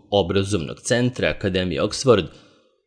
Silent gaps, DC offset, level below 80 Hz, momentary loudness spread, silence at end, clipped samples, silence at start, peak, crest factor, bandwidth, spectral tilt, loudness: none; under 0.1%; -46 dBFS; 7 LU; 0.55 s; under 0.1%; 0.1 s; -4 dBFS; 18 dB; 10.5 kHz; -5 dB/octave; -21 LUFS